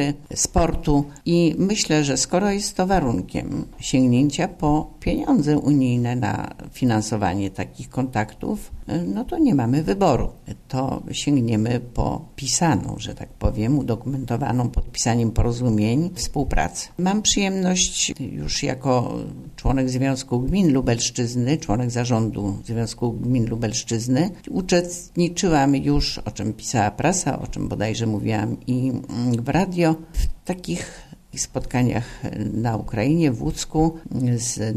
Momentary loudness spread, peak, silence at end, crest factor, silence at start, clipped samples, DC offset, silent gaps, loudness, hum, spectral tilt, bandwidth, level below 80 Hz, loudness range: 9 LU; -4 dBFS; 0 s; 16 dB; 0 s; under 0.1%; under 0.1%; none; -22 LUFS; none; -5 dB/octave; 14 kHz; -34 dBFS; 3 LU